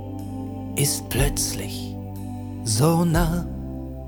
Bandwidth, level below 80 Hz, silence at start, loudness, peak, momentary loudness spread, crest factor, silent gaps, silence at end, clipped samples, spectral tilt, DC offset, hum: over 20 kHz; -34 dBFS; 0 s; -24 LUFS; -6 dBFS; 14 LU; 18 dB; none; 0 s; under 0.1%; -4.5 dB/octave; under 0.1%; 50 Hz at -45 dBFS